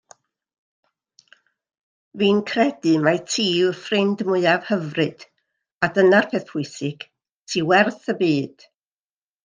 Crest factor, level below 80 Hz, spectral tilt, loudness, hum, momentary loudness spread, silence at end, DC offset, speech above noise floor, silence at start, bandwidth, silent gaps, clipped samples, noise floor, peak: 20 dB; -68 dBFS; -5 dB/octave; -20 LUFS; none; 11 LU; 0.95 s; under 0.1%; over 70 dB; 2.15 s; 9.8 kHz; 5.77-5.81 s, 7.33-7.44 s; under 0.1%; under -90 dBFS; -2 dBFS